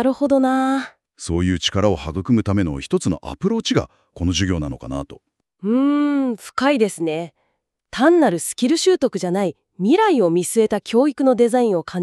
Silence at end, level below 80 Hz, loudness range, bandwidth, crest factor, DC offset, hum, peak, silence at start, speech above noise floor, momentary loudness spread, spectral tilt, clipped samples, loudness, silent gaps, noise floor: 0 s; -42 dBFS; 4 LU; 13.5 kHz; 16 dB; under 0.1%; none; -2 dBFS; 0 s; 53 dB; 11 LU; -5.5 dB/octave; under 0.1%; -19 LUFS; none; -71 dBFS